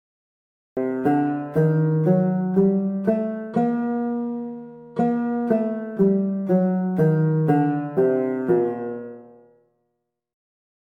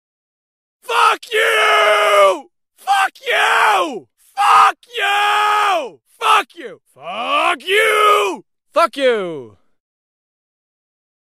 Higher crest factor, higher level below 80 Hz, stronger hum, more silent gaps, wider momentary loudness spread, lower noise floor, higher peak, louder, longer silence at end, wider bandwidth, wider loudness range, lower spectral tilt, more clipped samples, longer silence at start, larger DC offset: about the same, 16 dB vs 16 dB; first, -62 dBFS vs -70 dBFS; neither; neither; second, 10 LU vs 18 LU; first, -77 dBFS vs -40 dBFS; second, -6 dBFS vs 0 dBFS; second, -22 LUFS vs -14 LUFS; about the same, 1.7 s vs 1.8 s; second, 3.6 kHz vs 15.5 kHz; about the same, 3 LU vs 3 LU; first, -11.5 dB/octave vs -1 dB/octave; neither; second, 0.75 s vs 0.9 s; neither